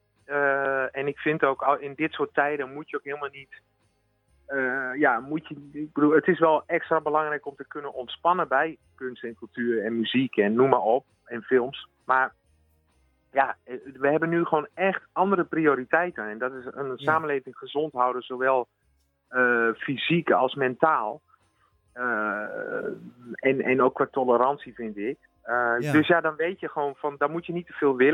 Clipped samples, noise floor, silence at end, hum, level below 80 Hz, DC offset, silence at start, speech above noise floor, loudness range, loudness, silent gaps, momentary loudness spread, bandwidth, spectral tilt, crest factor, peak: under 0.1%; -69 dBFS; 0 s; none; -70 dBFS; under 0.1%; 0.3 s; 44 dB; 4 LU; -25 LUFS; none; 13 LU; 11 kHz; -7.5 dB/octave; 24 dB; -2 dBFS